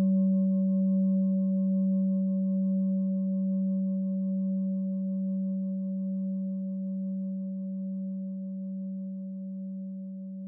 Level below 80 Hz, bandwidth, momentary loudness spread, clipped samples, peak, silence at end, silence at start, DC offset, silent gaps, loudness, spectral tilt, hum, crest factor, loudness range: under -90 dBFS; 1.1 kHz; 12 LU; under 0.1%; -20 dBFS; 0 s; 0 s; under 0.1%; none; -30 LUFS; -17 dB/octave; none; 10 dB; 8 LU